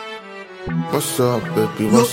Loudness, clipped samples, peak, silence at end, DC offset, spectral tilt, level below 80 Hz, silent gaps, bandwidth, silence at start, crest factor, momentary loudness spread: -19 LUFS; under 0.1%; 0 dBFS; 0 s; under 0.1%; -5 dB/octave; -50 dBFS; none; 16.5 kHz; 0 s; 18 dB; 16 LU